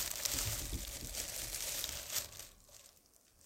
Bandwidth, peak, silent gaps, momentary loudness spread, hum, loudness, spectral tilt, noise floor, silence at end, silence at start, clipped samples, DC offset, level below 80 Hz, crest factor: 17 kHz; -16 dBFS; none; 19 LU; none; -39 LUFS; -1 dB/octave; -67 dBFS; 0 s; 0 s; under 0.1%; under 0.1%; -52 dBFS; 26 dB